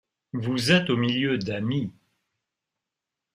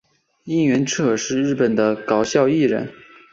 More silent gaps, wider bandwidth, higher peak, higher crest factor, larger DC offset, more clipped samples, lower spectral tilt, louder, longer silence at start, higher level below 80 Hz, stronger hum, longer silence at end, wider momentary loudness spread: neither; first, 15.5 kHz vs 7.8 kHz; second, -8 dBFS vs -4 dBFS; about the same, 20 dB vs 16 dB; neither; neither; about the same, -5.5 dB/octave vs -5 dB/octave; second, -24 LUFS vs -19 LUFS; about the same, 0.35 s vs 0.45 s; about the same, -62 dBFS vs -58 dBFS; neither; first, 1.45 s vs 0.4 s; first, 12 LU vs 5 LU